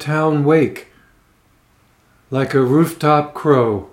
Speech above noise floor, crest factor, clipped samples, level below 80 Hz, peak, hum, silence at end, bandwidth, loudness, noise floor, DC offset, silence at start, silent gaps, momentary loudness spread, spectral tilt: 41 dB; 18 dB; under 0.1%; -58 dBFS; 0 dBFS; none; 0.05 s; 16.5 kHz; -16 LUFS; -56 dBFS; under 0.1%; 0 s; none; 8 LU; -7.5 dB/octave